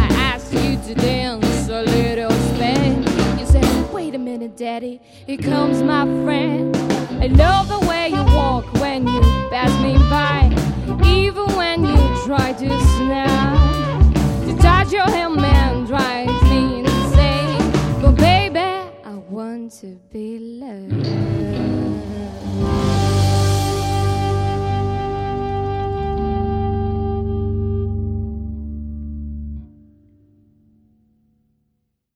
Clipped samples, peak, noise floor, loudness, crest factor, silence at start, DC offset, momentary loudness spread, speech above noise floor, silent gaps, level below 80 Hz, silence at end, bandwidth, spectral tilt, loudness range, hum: under 0.1%; -2 dBFS; -71 dBFS; -17 LUFS; 16 dB; 0 s; under 0.1%; 15 LU; 54 dB; none; -22 dBFS; 2.5 s; 15.5 kHz; -6.5 dB/octave; 9 LU; none